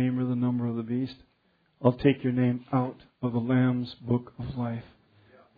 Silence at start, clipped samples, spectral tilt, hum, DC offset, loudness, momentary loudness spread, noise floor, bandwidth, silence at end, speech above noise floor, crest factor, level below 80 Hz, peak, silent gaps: 0 s; under 0.1%; -11 dB/octave; none; under 0.1%; -28 LUFS; 10 LU; -63 dBFS; 4.9 kHz; 0.75 s; 36 dB; 22 dB; -58 dBFS; -6 dBFS; none